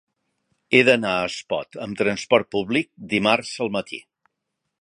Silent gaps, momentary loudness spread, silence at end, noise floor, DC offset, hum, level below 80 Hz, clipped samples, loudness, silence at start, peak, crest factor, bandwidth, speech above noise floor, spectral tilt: none; 12 LU; 0.8 s; -79 dBFS; under 0.1%; none; -60 dBFS; under 0.1%; -21 LUFS; 0.7 s; 0 dBFS; 22 dB; 11 kHz; 58 dB; -4.5 dB/octave